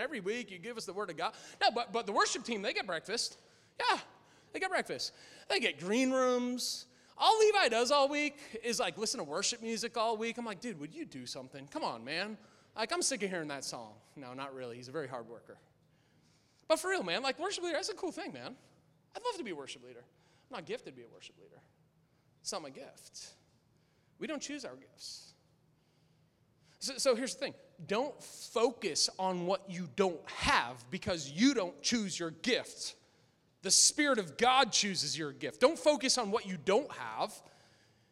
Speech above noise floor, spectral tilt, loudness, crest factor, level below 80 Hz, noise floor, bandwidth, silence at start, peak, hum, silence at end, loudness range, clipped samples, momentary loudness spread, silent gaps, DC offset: 36 dB; -2 dB/octave; -33 LUFS; 24 dB; -68 dBFS; -71 dBFS; 16 kHz; 0 s; -12 dBFS; none; 0.7 s; 17 LU; under 0.1%; 18 LU; none; under 0.1%